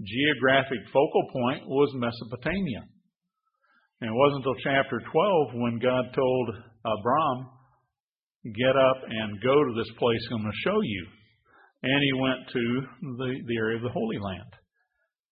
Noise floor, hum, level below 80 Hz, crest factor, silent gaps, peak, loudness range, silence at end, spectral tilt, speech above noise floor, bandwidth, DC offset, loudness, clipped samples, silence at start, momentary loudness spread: under -90 dBFS; none; -58 dBFS; 20 dB; 8.00-8.07 s, 8.23-8.27 s, 8.36-8.40 s; -6 dBFS; 3 LU; 0.8 s; -10 dB/octave; over 64 dB; 5.2 kHz; under 0.1%; -26 LUFS; under 0.1%; 0 s; 11 LU